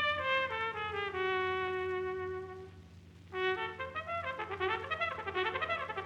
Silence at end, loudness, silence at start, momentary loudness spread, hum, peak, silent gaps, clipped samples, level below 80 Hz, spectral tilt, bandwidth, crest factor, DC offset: 0 s; -35 LUFS; 0 s; 10 LU; none; -18 dBFS; none; under 0.1%; -64 dBFS; -5.5 dB/octave; 8.8 kHz; 18 dB; under 0.1%